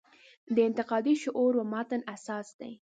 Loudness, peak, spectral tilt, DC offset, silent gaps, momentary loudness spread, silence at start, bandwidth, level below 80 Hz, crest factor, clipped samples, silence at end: -30 LUFS; -14 dBFS; -5.5 dB/octave; under 0.1%; 2.54-2.59 s; 11 LU; 0.5 s; 9.2 kHz; -80 dBFS; 16 dB; under 0.1%; 0.2 s